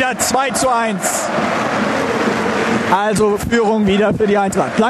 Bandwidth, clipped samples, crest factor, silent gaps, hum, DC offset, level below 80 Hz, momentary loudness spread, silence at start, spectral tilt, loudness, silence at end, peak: 14.5 kHz; under 0.1%; 16 dB; none; none; under 0.1%; -42 dBFS; 3 LU; 0 s; -4 dB/octave; -15 LUFS; 0 s; 0 dBFS